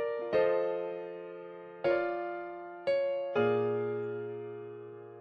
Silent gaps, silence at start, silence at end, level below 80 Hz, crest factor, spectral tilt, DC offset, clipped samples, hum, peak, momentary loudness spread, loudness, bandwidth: none; 0 s; 0 s; -74 dBFS; 16 dB; -8 dB/octave; under 0.1%; under 0.1%; none; -16 dBFS; 16 LU; -33 LUFS; 6 kHz